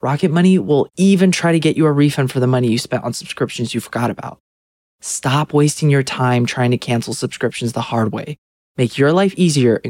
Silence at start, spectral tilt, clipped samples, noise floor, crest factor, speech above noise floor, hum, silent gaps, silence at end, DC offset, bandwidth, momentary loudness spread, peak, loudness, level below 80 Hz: 0.05 s; -6 dB/octave; under 0.1%; under -90 dBFS; 14 dB; over 74 dB; none; 4.40-4.99 s, 8.38-8.75 s; 0 s; under 0.1%; 16 kHz; 10 LU; -2 dBFS; -16 LUFS; -58 dBFS